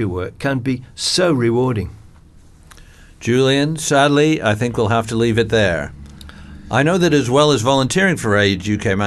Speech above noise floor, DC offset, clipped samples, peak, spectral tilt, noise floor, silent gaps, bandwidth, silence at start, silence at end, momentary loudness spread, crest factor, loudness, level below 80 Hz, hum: 28 dB; under 0.1%; under 0.1%; 0 dBFS; -5 dB/octave; -44 dBFS; none; 12.5 kHz; 0 s; 0 s; 9 LU; 16 dB; -16 LUFS; -42 dBFS; none